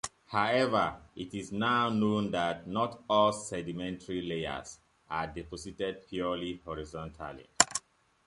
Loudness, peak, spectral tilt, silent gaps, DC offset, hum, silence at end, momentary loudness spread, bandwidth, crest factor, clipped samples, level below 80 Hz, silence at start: -32 LUFS; 0 dBFS; -3.5 dB/octave; none; under 0.1%; none; 0.5 s; 15 LU; 11.5 kHz; 32 dB; under 0.1%; -58 dBFS; 0.05 s